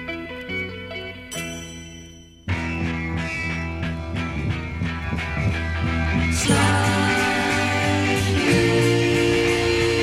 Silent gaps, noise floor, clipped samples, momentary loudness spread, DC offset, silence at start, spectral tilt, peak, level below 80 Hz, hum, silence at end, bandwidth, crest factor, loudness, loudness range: none; -43 dBFS; under 0.1%; 13 LU; under 0.1%; 0 s; -5 dB/octave; -6 dBFS; -36 dBFS; none; 0 s; 15.5 kHz; 16 dB; -22 LUFS; 9 LU